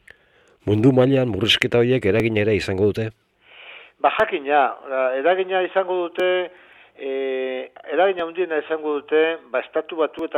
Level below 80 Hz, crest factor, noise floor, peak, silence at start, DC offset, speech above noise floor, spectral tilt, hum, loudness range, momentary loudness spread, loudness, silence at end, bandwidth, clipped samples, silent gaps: -54 dBFS; 20 dB; -57 dBFS; 0 dBFS; 0.65 s; under 0.1%; 37 dB; -6 dB/octave; none; 4 LU; 11 LU; -20 LUFS; 0 s; 13 kHz; under 0.1%; none